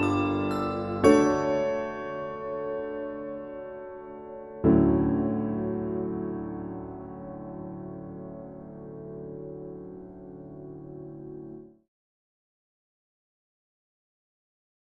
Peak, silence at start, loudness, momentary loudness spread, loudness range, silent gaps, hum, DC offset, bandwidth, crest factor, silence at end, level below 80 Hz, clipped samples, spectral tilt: -6 dBFS; 0 s; -28 LUFS; 21 LU; 19 LU; none; none; under 0.1%; 11 kHz; 24 dB; 3.2 s; -52 dBFS; under 0.1%; -7.5 dB/octave